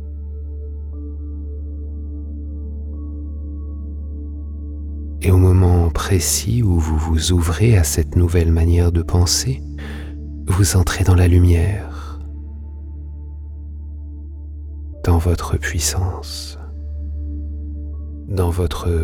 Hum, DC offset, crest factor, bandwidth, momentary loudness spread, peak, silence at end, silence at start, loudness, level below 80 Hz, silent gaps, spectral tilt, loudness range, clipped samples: none; under 0.1%; 16 dB; 16 kHz; 18 LU; -2 dBFS; 0 s; 0 s; -19 LUFS; -26 dBFS; none; -5.5 dB/octave; 13 LU; under 0.1%